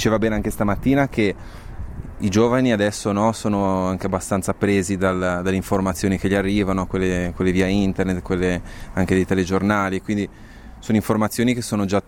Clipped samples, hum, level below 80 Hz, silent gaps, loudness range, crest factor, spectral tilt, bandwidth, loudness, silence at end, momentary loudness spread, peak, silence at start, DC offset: under 0.1%; none; -38 dBFS; none; 1 LU; 14 dB; -6 dB/octave; 17 kHz; -21 LUFS; 0.05 s; 6 LU; -6 dBFS; 0 s; under 0.1%